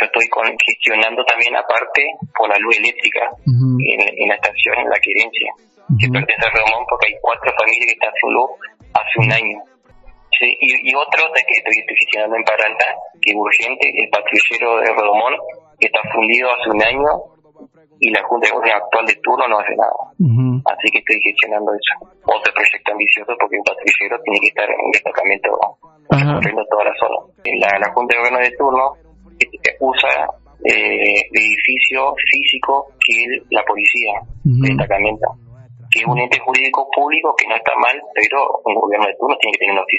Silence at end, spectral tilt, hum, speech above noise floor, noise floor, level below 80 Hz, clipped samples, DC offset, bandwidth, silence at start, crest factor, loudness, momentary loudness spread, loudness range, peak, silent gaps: 0 s; -5 dB/octave; none; 29 dB; -45 dBFS; -48 dBFS; under 0.1%; under 0.1%; 8.6 kHz; 0 s; 16 dB; -14 LUFS; 6 LU; 2 LU; 0 dBFS; none